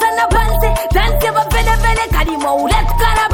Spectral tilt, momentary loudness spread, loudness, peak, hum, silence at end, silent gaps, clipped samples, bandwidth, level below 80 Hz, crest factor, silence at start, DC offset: -4.5 dB/octave; 2 LU; -14 LUFS; -2 dBFS; none; 0 s; none; under 0.1%; 17.5 kHz; -16 dBFS; 12 dB; 0 s; under 0.1%